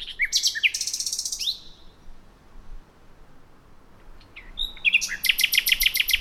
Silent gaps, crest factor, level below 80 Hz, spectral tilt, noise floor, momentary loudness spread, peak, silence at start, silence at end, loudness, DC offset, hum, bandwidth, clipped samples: none; 22 dB; -44 dBFS; 2.5 dB/octave; -49 dBFS; 12 LU; -6 dBFS; 0 s; 0 s; -21 LUFS; under 0.1%; none; 19 kHz; under 0.1%